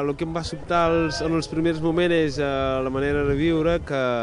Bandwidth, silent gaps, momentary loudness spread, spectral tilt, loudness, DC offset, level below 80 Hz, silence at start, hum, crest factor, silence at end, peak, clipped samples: 11 kHz; none; 4 LU; -6 dB/octave; -23 LUFS; under 0.1%; -38 dBFS; 0 s; none; 12 dB; 0 s; -10 dBFS; under 0.1%